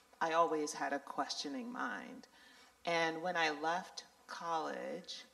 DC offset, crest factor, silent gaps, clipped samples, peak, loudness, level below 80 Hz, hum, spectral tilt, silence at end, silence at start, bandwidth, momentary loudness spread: under 0.1%; 20 dB; none; under 0.1%; -20 dBFS; -38 LUFS; -86 dBFS; none; -3 dB/octave; 0.05 s; 0.2 s; 14.5 kHz; 14 LU